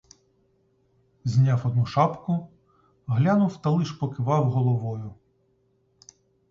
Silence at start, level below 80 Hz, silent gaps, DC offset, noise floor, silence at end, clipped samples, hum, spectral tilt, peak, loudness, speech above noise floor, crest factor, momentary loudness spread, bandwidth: 1.25 s; -58 dBFS; none; under 0.1%; -67 dBFS; 1.4 s; under 0.1%; none; -8.5 dB/octave; -8 dBFS; -24 LUFS; 44 dB; 18 dB; 12 LU; 7.4 kHz